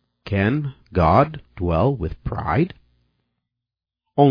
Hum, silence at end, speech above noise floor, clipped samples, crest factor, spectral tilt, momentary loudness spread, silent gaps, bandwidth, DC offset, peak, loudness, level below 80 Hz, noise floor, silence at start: 60 Hz at -45 dBFS; 0 s; 66 dB; under 0.1%; 18 dB; -10 dB/octave; 11 LU; none; 5.2 kHz; under 0.1%; -2 dBFS; -21 LUFS; -38 dBFS; -86 dBFS; 0.25 s